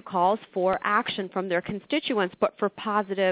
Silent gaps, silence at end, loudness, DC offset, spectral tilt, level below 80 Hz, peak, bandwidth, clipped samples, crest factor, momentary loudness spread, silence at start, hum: none; 0 s; -26 LUFS; under 0.1%; -9 dB/octave; -66 dBFS; -8 dBFS; 4 kHz; under 0.1%; 18 dB; 5 LU; 0.05 s; none